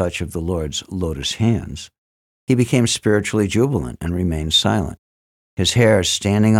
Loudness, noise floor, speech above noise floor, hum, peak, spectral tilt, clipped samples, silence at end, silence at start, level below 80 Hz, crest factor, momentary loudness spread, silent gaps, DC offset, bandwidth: -18 LUFS; under -90 dBFS; over 72 dB; none; -4 dBFS; -5 dB/octave; under 0.1%; 0 s; 0 s; -38 dBFS; 16 dB; 12 LU; 1.98-2.47 s, 4.98-5.57 s; under 0.1%; 16 kHz